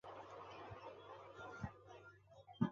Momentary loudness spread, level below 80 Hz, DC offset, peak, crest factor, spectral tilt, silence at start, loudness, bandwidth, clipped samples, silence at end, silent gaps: 11 LU; -70 dBFS; under 0.1%; -24 dBFS; 26 dB; -6.5 dB/octave; 0.05 s; -53 LUFS; 7.4 kHz; under 0.1%; 0 s; none